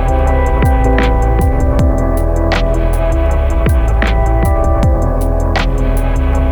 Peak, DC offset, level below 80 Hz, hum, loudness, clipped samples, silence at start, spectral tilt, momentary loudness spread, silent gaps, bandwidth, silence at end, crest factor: 0 dBFS; under 0.1%; -12 dBFS; none; -14 LUFS; under 0.1%; 0 s; -7 dB/octave; 3 LU; none; 19 kHz; 0 s; 10 dB